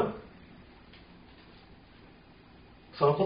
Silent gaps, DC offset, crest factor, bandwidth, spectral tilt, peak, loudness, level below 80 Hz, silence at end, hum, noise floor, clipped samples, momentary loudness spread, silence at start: none; under 0.1%; 22 dB; 5 kHz; -6 dB/octave; -12 dBFS; -31 LUFS; -60 dBFS; 0 s; none; -55 dBFS; under 0.1%; 25 LU; 0 s